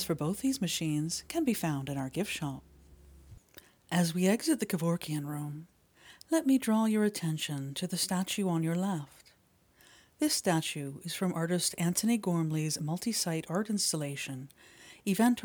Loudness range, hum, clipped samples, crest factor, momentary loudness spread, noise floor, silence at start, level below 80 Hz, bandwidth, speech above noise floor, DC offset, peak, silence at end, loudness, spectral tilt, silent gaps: 3 LU; none; under 0.1%; 18 dB; 11 LU; -67 dBFS; 0 s; -66 dBFS; over 20 kHz; 35 dB; under 0.1%; -14 dBFS; 0 s; -32 LUFS; -4.5 dB/octave; none